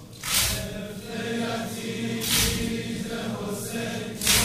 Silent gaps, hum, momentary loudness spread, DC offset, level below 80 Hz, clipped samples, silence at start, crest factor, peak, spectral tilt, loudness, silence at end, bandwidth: none; none; 10 LU; under 0.1%; -42 dBFS; under 0.1%; 0 s; 20 dB; -6 dBFS; -2.5 dB/octave; -27 LUFS; 0 s; 16 kHz